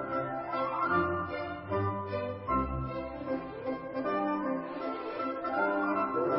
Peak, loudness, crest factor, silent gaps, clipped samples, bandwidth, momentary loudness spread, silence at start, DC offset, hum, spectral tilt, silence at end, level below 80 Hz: -16 dBFS; -33 LUFS; 16 dB; none; under 0.1%; 5.8 kHz; 7 LU; 0 s; under 0.1%; none; -10.5 dB/octave; 0 s; -50 dBFS